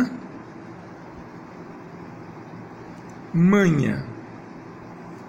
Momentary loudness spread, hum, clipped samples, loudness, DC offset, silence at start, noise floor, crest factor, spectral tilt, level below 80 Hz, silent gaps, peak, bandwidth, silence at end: 22 LU; none; under 0.1%; -21 LUFS; under 0.1%; 0 s; -40 dBFS; 18 dB; -7.5 dB/octave; -54 dBFS; none; -8 dBFS; 8 kHz; 0 s